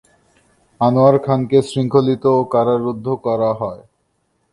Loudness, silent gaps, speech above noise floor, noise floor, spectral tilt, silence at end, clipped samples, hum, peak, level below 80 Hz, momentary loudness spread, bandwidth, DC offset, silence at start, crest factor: -16 LUFS; none; 50 dB; -66 dBFS; -8 dB/octave; 0.75 s; under 0.1%; none; 0 dBFS; -56 dBFS; 8 LU; 11.5 kHz; under 0.1%; 0.8 s; 16 dB